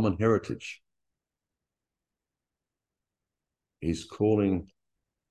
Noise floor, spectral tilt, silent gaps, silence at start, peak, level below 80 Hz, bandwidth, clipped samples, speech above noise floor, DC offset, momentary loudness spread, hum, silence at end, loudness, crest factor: -89 dBFS; -7.5 dB/octave; none; 0 s; -12 dBFS; -52 dBFS; 11 kHz; under 0.1%; 62 dB; under 0.1%; 14 LU; none; 0.65 s; -29 LUFS; 20 dB